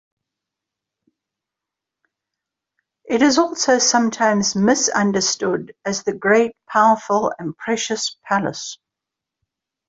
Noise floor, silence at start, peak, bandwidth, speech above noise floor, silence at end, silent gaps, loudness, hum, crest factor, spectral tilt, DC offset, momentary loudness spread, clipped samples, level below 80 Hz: -85 dBFS; 3.05 s; -2 dBFS; 8 kHz; 67 dB; 1.15 s; none; -18 LUFS; none; 18 dB; -3 dB/octave; under 0.1%; 9 LU; under 0.1%; -62 dBFS